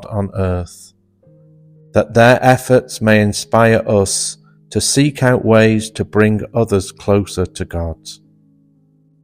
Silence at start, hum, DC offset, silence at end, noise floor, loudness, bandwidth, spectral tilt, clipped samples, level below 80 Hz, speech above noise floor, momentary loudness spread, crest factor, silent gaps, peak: 0 s; none; under 0.1%; 1.1 s; -54 dBFS; -14 LUFS; 16 kHz; -5 dB/octave; under 0.1%; -40 dBFS; 40 dB; 12 LU; 16 dB; none; 0 dBFS